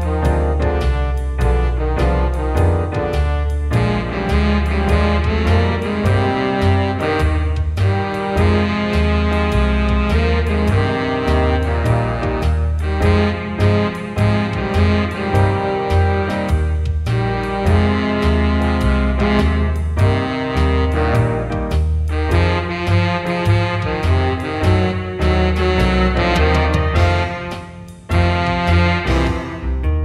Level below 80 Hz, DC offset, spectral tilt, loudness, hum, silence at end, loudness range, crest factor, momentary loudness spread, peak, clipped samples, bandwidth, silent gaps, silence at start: -22 dBFS; under 0.1%; -7.5 dB/octave; -17 LUFS; none; 0 s; 1 LU; 14 dB; 4 LU; 0 dBFS; under 0.1%; 11.5 kHz; none; 0 s